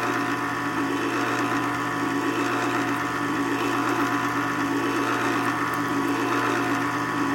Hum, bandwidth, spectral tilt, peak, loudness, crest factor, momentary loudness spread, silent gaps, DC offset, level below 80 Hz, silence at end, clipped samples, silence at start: 60 Hz at -40 dBFS; 16.5 kHz; -4.5 dB/octave; -12 dBFS; -24 LUFS; 14 dB; 2 LU; none; under 0.1%; -58 dBFS; 0 s; under 0.1%; 0 s